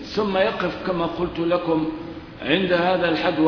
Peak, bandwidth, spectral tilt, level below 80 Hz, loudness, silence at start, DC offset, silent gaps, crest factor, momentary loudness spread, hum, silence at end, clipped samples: -6 dBFS; 5.4 kHz; -7 dB/octave; -48 dBFS; -22 LUFS; 0 s; under 0.1%; none; 16 dB; 9 LU; none; 0 s; under 0.1%